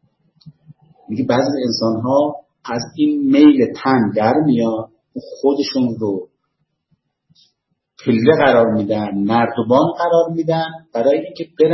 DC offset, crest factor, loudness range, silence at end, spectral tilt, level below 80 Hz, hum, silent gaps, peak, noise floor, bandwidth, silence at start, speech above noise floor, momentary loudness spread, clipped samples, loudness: under 0.1%; 16 dB; 5 LU; 0 s; -7 dB/octave; -58 dBFS; none; none; 0 dBFS; -71 dBFS; 6.2 kHz; 0.45 s; 55 dB; 13 LU; under 0.1%; -16 LUFS